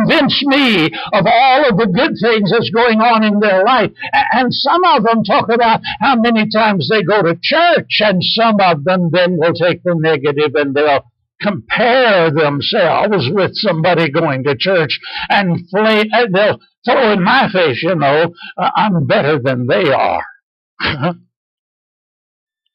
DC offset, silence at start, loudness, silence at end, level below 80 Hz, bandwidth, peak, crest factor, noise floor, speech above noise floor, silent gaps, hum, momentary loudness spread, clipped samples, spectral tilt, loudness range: under 0.1%; 0 s; -12 LUFS; 1.6 s; -50 dBFS; 7.4 kHz; -4 dBFS; 10 dB; under -90 dBFS; over 78 dB; 16.77-16.82 s, 20.43-20.77 s; none; 6 LU; under 0.1%; -7.5 dB/octave; 3 LU